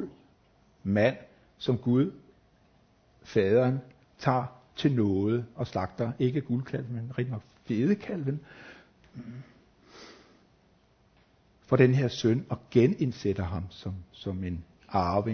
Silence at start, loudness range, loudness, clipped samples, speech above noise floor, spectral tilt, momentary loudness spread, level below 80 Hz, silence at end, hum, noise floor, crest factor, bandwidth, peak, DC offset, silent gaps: 0 s; 7 LU; -29 LUFS; under 0.1%; 36 dB; -8 dB/octave; 19 LU; -52 dBFS; 0 s; none; -64 dBFS; 22 dB; 6.6 kHz; -6 dBFS; under 0.1%; none